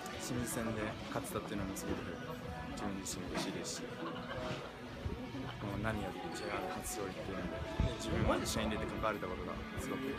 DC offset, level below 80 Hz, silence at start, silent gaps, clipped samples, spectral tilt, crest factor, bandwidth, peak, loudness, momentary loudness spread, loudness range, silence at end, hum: under 0.1%; -50 dBFS; 0 s; none; under 0.1%; -4.5 dB/octave; 20 dB; 15.5 kHz; -20 dBFS; -40 LUFS; 7 LU; 4 LU; 0 s; none